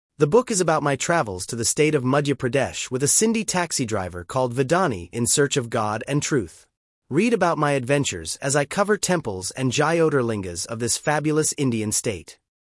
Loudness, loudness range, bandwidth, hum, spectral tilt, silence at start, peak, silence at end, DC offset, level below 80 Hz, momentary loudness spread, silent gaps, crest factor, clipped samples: -22 LUFS; 2 LU; 12 kHz; none; -4 dB/octave; 0.2 s; -4 dBFS; 0.35 s; under 0.1%; -58 dBFS; 7 LU; 6.77-7.02 s; 18 dB; under 0.1%